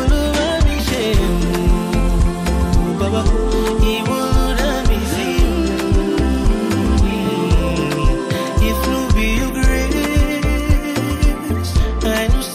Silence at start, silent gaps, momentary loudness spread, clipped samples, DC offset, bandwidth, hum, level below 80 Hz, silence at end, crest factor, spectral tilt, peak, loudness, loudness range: 0 s; none; 2 LU; under 0.1%; under 0.1%; 16 kHz; none; -18 dBFS; 0 s; 14 dB; -5.5 dB/octave; -2 dBFS; -17 LUFS; 0 LU